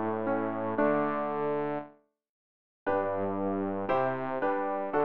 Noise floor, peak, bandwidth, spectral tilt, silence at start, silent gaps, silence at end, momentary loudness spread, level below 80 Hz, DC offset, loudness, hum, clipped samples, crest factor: -53 dBFS; -14 dBFS; 5.4 kHz; -9.5 dB/octave; 0 s; 2.29-2.86 s; 0 s; 5 LU; -66 dBFS; 0.4%; -31 LUFS; none; under 0.1%; 16 dB